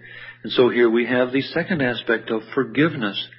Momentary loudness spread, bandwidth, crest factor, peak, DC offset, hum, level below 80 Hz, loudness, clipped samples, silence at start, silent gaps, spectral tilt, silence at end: 8 LU; 5.8 kHz; 16 dB; -4 dBFS; under 0.1%; none; -62 dBFS; -20 LUFS; under 0.1%; 0.05 s; none; -10.5 dB/octave; 0.1 s